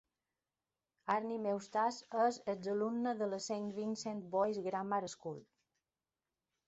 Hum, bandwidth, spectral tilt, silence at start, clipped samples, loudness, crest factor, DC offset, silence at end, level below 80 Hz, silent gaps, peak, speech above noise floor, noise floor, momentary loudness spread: none; 8 kHz; -4.5 dB/octave; 1.05 s; under 0.1%; -38 LUFS; 18 dB; under 0.1%; 1.25 s; -82 dBFS; none; -20 dBFS; over 52 dB; under -90 dBFS; 8 LU